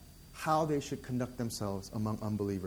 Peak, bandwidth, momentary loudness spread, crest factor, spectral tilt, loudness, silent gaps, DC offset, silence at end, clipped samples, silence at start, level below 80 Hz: -16 dBFS; 20 kHz; 7 LU; 18 dB; -6 dB/octave; -35 LUFS; none; under 0.1%; 0 s; under 0.1%; 0 s; -58 dBFS